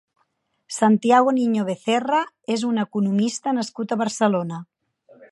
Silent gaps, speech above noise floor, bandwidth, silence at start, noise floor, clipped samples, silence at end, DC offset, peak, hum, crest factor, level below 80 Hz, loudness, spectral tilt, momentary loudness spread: none; 49 dB; 11.5 kHz; 0.7 s; -70 dBFS; under 0.1%; 0.05 s; under 0.1%; -4 dBFS; none; 18 dB; -74 dBFS; -21 LUFS; -5 dB/octave; 9 LU